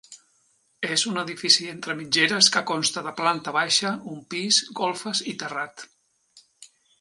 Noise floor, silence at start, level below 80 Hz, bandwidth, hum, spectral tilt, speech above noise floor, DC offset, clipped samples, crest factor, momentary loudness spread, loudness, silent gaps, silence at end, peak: -66 dBFS; 0.1 s; -74 dBFS; 11.5 kHz; none; -1.5 dB/octave; 41 dB; under 0.1%; under 0.1%; 24 dB; 14 LU; -22 LUFS; none; 0.35 s; -2 dBFS